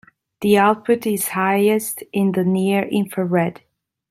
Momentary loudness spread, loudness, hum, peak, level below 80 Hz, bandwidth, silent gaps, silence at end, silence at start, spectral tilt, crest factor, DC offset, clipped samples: 7 LU; -19 LUFS; none; -2 dBFS; -62 dBFS; 16 kHz; none; 0.6 s; 0.4 s; -5.5 dB/octave; 16 dB; under 0.1%; under 0.1%